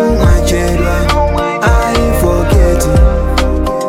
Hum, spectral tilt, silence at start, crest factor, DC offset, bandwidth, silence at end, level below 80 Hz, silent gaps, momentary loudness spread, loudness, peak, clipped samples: none; -6 dB/octave; 0 s; 10 dB; under 0.1%; 16 kHz; 0 s; -14 dBFS; none; 3 LU; -12 LUFS; 0 dBFS; under 0.1%